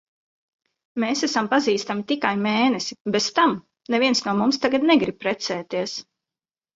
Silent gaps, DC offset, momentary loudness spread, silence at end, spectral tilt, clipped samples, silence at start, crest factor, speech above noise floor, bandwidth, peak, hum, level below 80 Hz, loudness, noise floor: 3.01-3.05 s; under 0.1%; 8 LU; 0.75 s; -4 dB/octave; under 0.1%; 0.95 s; 18 dB; over 68 dB; 7.8 kHz; -4 dBFS; none; -66 dBFS; -22 LUFS; under -90 dBFS